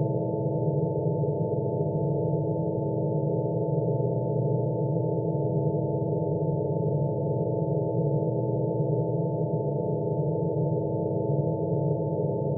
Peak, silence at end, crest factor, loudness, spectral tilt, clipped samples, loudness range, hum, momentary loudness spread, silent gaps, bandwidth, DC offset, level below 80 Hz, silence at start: -14 dBFS; 0 s; 14 dB; -27 LUFS; -6.5 dB/octave; under 0.1%; 0 LU; none; 1 LU; none; 1 kHz; under 0.1%; -58 dBFS; 0 s